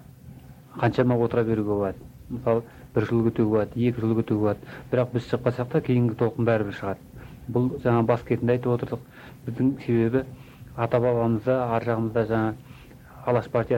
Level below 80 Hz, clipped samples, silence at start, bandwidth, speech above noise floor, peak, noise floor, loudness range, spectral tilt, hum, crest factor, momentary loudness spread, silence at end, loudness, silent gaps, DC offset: -52 dBFS; under 0.1%; 0 s; 16 kHz; 22 dB; -8 dBFS; -46 dBFS; 1 LU; -9 dB/octave; none; 18 dB; 13 LU; 0 s; -25 LUFS; none; under 0.1%